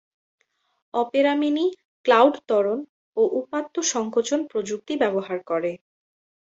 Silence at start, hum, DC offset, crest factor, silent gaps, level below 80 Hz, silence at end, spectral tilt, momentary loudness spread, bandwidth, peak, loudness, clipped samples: 0.95 s; none; under 0.1%; 20 dB; 1.85-2.04 s, 2.89-3.13 s; -72 dBFS; 0.75 s; -3.5 dB/octave; 10 LU; 8 kHz; -4 dBFS; -23 LUFS; under 0.1%